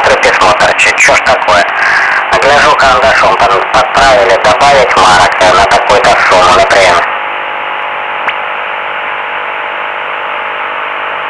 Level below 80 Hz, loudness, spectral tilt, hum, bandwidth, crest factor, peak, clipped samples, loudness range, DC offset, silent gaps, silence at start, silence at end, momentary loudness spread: -34 dBFS; -7 LUFS; -2 dB/octave; none; 12 kHz; 8 dB; 0 dBFS; under 0.1%; 9 LU; under 0.1%; none; 0 s; 0 s; 10 LU